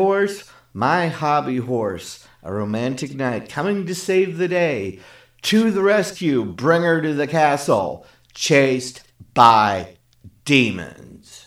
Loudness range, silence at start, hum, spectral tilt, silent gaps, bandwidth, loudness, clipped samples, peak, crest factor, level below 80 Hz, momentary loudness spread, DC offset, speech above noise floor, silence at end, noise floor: 5 LU; 0 s; none; -5 dB/octave; none; 15.5 kHz; -19 LUFS; under 0.1%; 0 dBFS; 20 dB; -58 dBFS; 16 LU; under 0.1%; 29 dB; 0.05 s; -48 dBFS